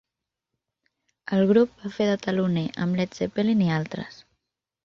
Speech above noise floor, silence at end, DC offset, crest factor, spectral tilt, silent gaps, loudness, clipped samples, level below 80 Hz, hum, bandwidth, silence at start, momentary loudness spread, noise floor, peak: 62 dB; 0.75 s; under 0.1%; 18 dB; -7.5 dB/octave; none; -24 LUFS; under 0.1%; -62 dBFS; none; 7.2 kHz; 1.25 s; 13 LU; -86 dBFS; -8 dBFS